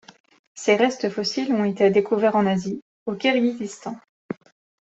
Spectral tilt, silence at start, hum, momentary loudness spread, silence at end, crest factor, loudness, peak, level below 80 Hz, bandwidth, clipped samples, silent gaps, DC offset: -5 dB/octave; 0.55 s; none; 17 LU; 0.55 s; 18 dB; -22 LUFS; -4 dBFS; -68 dBFS; 8.2 kHz; under 0.1%; 2.82-3.06 s, 4.09-4.29 s; under 0.1%